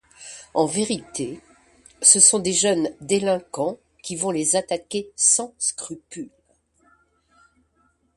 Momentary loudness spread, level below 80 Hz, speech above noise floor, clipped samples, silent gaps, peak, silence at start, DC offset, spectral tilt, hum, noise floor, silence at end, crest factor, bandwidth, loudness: 22 LU; -62 dBFS; 44 dB; under 0.1%; none; -2 dBFS; 0.2 s; under 0.1%; -2 dB/octave; none; -65 dBFS; 1.9 s; 22 dB; 11.5 kHz; -19 LUFS